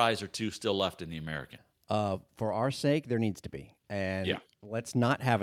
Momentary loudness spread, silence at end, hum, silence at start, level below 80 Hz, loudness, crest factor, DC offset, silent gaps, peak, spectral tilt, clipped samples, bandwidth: 12 LU; 0 s; none; 0 s; -64 dBFS; -33 LUFS; 20 dB; under 0.1%; none; -12 dBFS; -5.5 dB/octave; under 0.1%; 15.5 kHz